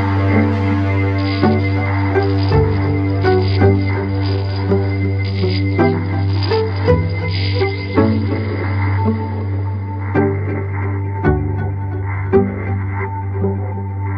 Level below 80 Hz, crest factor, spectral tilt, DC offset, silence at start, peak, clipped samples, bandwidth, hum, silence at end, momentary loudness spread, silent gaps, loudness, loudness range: -36 dBFS; 16 dB; -9.5 dB/octave; under 0.1%; 0 s; 0 dBFS; under 0.1%; 5.4 kHz; none; 0 s; 7 LU; none; -17 LUFS; 4 LU